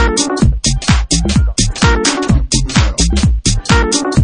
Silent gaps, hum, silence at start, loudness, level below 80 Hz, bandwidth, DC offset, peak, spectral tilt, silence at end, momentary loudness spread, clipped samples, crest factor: none; none; 0 s; -13 LUFS; -16 dBFS; 10.5 kHz; under 0.1%; 0 dBFS; -4 dB/octave; 0 s; 2 LU; under 0.1%; 12 dB